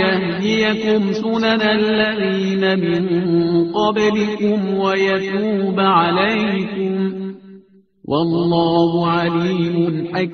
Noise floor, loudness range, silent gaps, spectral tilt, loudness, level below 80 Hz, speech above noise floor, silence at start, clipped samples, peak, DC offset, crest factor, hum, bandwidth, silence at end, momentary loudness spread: -47 dBFS; 2 LU; none; -4.5 dB/octave; -17 LUFS; -54 dBFS; 30 dB; 0 s; under 0.1%; -2 dBFS; under 0.1%; 16 dB; none; 6.6 kHz; 0 s; 5 LU